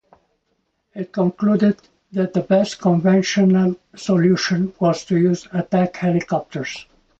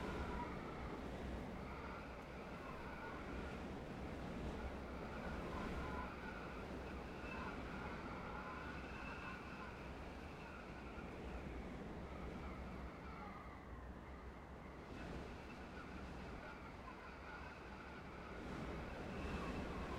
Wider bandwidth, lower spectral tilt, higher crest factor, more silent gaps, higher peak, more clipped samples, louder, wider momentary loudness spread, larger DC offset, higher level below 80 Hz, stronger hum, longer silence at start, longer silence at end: second, 7.8 kHz vs 16 kHz; about the same, -6.5 dB/octave vs -6.5 dB/octave; about the same, 14 dB vs 16 dB; neither; first, -4 dBFS vs -34 dBFS; neither; first, -19 LUFS vs -50 LUFS; first, 12 LU vs 7 LU; neither; about the same, -58 dBFS vs -56 dBFS; neither; first, 0.95 s vs 0 s; first, 0.4 s vs 0 s